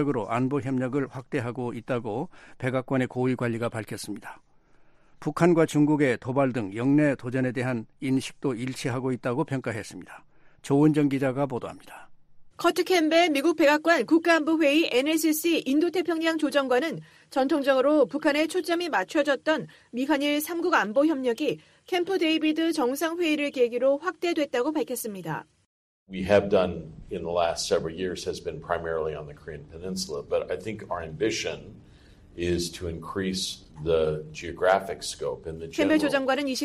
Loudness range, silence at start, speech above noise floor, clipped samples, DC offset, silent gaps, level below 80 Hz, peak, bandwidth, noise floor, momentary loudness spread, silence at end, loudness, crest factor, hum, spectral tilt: 8 LU; 0 s; 30 dB; under 0.1%; under 0.1%; 25.66-26.06 s; -56 dBFS; -6 dBFS; 15 kHz; -56 dBFS; 13 LU; 0 s; -26 LUFS; 20 dB; none; -5 dB/octave